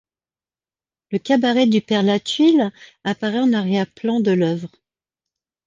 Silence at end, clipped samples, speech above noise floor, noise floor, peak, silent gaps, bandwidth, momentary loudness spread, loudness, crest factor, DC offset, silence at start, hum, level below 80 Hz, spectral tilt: 1 s; under 0.1%; over 72 dB; under -90 dBFS; -4 dBFS; none; 9.4 kHz; 11 LU; -19 LUFS; 16 dB; under 0.1%; 1.1 s; none; -66 dBFS; -6 dB/octave